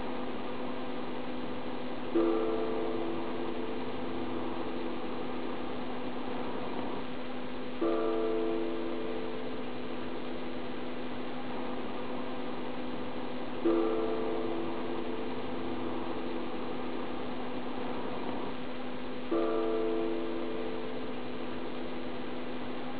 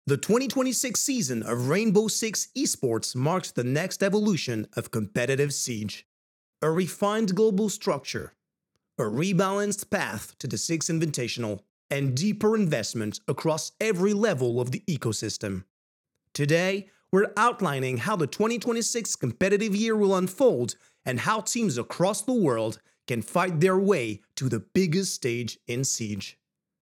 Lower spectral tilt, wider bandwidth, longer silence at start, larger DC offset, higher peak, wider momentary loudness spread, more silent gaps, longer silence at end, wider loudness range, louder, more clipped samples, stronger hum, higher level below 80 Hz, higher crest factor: about the same, -4 dB/octave vs -4.5 dB/octave; second, 4 kHz vs 18 kHz; about the same, 0 s vs 0.05 s; first, 2% vs under 0.1%; second, -18 dBFS vs -10 dBFS; about the same, 8 LU vs 9 LU; second, none vs 6.05-6.53 s, 11.70-11.89 s, 15.70-16.04 s; second, 0 s vs 0.5 s; about the same, 4 LU vs 3 LU; second, -36 LUFS vs -26 LUFS; neither; neither; first, -60 dBFS vs -70 dBFS; about the same, 18 dB vs 18 dB